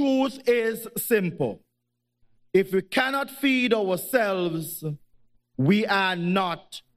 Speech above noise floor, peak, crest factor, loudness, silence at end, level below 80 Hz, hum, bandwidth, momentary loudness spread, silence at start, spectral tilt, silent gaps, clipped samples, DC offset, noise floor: 54 dB; -8 dBFS; 18 dB; -24 LUFS; 0.2 s; -66 dBFS; none; 15.5 kHz; 11 LU; 0 s; -5 dB/octave; none; under 0.1%; under 0.1%; -79 dBFS